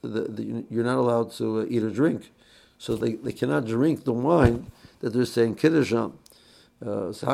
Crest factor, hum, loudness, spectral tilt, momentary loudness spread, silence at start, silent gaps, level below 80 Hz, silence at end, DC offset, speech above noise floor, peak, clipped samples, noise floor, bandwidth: 20 dB; none; -25 LUFS; -7 dB/octave; 12 LU; 0.05 s; none; -46 dBFS; 0 s; under 0.1%; 31 dB; -6 dBFS; under 0.1%; -56 dBFS; 14 kHz